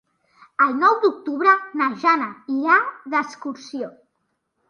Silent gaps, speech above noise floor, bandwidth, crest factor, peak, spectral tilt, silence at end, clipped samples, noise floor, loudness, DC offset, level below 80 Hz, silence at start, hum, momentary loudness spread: none; 53 dB; 10 kHz; 18 dB; -4 dBFS; -4 dB/octave; 0.8 s; under 0.1%; -73 dBFS; -19 LUFS; under 0.1%; -76 dBFS; 0.6 s; none; 15 LU